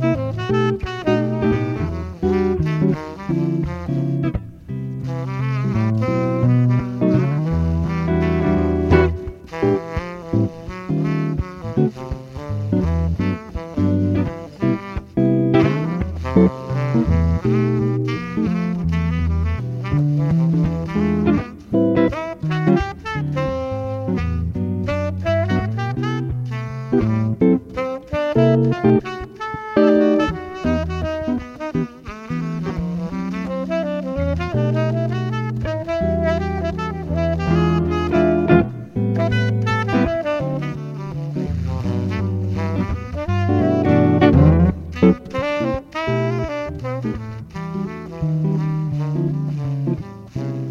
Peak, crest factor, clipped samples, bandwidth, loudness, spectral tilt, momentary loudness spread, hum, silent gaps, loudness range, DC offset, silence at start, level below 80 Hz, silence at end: 0 dBFS; 20 dB; under 0.1%; 7.4 kHz; -20 LUFS; -9 dB/octave; 10 LU; none; none; 6 LU; under 0.1%; 0 s; -34 dBFS; 0 s